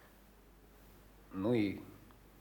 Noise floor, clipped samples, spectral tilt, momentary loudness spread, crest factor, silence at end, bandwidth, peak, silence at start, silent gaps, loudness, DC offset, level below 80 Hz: -61 dBFS; under 0.1%; -7.5 dB/octave; 27 LU; 20 dB; 0.35 s; over 20 kHz; -22 dBFS; 0.85 s; none; -37 LUFS; under 0.1%; -64 dBFS